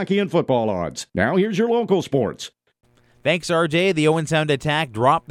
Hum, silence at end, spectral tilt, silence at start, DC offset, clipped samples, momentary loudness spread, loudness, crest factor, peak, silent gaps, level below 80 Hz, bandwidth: none; 0.1 s; -5.5 dB/octave; 0 s; under 0.1%; under 0.1%; 8 LU; -20 LUFS; 16 dB; -4 dBFS; none; -54 dBFS; 14 kHz